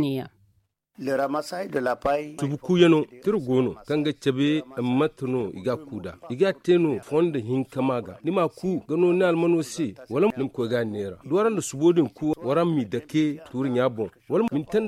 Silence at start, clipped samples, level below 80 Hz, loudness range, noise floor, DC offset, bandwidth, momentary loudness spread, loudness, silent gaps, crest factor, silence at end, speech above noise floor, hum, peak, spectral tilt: 0 s; under 0.1%; -60 dBFS; 2 LU; -67 dBFS; under 0.1%; 14 kHz; 9 LU; -25 LUFS; none; 18 dB; 0 s; 43 dB; none; -6 dBFS; -6.5 dB/octave